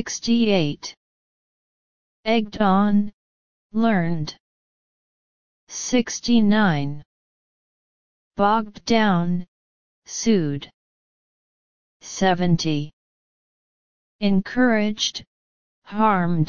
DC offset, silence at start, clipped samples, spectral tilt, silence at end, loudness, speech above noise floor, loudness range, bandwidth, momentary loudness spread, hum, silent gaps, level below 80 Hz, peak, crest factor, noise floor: 2%; 0 s; under 0.1%; -5 dB/octave; 0 s; -21 LUFS; over 70 dB; 4 LU; 7.2 kHz; 15 LU; none; 0.97-2.23 s, 3.13-3.70 s, 4.40-5.67 s, 7.05-8.31 s, 9.48-10.02 s, 10.74-12.00 s, 12.93-14.19 s, 15.27-15.82 s; -52 dBFS; -4 dBFS; 18 dB; under -90 dBFS